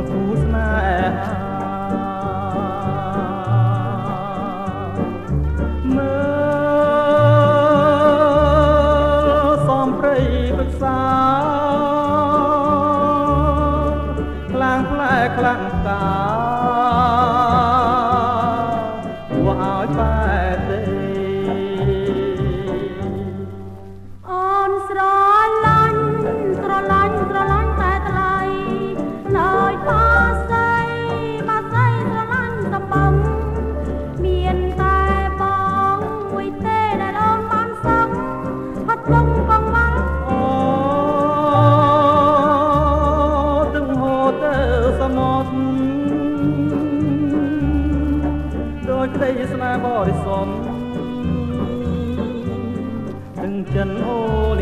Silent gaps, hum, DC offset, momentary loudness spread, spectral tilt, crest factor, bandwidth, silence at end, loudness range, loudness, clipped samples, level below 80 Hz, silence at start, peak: none; none; under 0.1%; 10 LU; -8 dB/octave; 18 dB; 10.5 kHz; 0 s; 7 LU; -18 LUFS; under 0.1%; -28 dBFS; 0 s; 0 dBFS